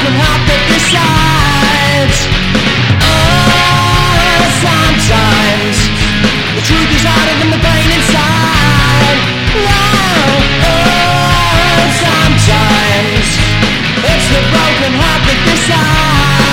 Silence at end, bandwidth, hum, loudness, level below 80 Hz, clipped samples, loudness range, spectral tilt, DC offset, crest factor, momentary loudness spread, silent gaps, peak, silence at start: 0 s; 17 kHz; none; -8 LUFS; -18 dBFS; 0.4%; 1 LU; -4 dB/octave; under 0.1%; 8 dB; 3 LU; none; 0 dBFS; 0 s